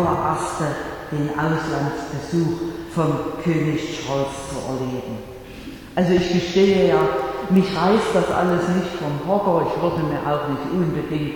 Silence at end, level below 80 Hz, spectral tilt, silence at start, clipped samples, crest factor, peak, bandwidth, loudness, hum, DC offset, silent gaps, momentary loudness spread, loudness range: 0 s; -44 dBFS; -6.5 dB/octave; 0 s; under 0.1%; 16 dB; -4 dBFS; 18.5 kHz; -21 LUFS; none; under 0.1%; none; 11 LU; 5 LU